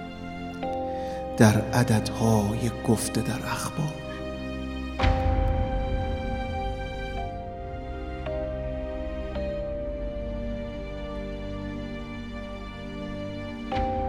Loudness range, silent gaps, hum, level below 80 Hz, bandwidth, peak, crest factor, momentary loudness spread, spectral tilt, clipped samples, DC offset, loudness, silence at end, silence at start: 10 LU; none; none; -36 dBFS; 16 kHz; -2 dBFS; 26 dB; 13 LU; -6 dB/octave; under 0.1%; under 0.1%; -29 LUFS; 0 s; 0 s